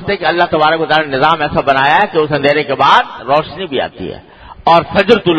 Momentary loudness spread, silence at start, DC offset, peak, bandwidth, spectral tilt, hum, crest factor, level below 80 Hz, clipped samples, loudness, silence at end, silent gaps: 9 LU; 0 s; under 0.1%; 0 dBFS; 9.8 kHz; -6 dB/octave; none; 12 dB; -42 dBFS; 0.3%; -12 LUFS; 0 s; none